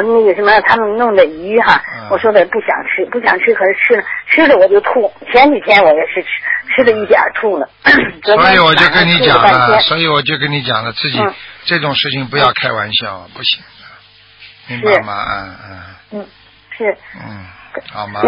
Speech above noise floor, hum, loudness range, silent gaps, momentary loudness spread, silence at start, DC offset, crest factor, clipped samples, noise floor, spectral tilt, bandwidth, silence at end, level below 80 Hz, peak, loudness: 30 dB; none; 11 LU; none; 15 LU; 0 s; under 0.1%; 12 dB; under 0.1%; -42 dBFS; -6.5 dB/octave; 8 kHz; 0 s; -46 dBFS; 0 dBFS; -11 LUFS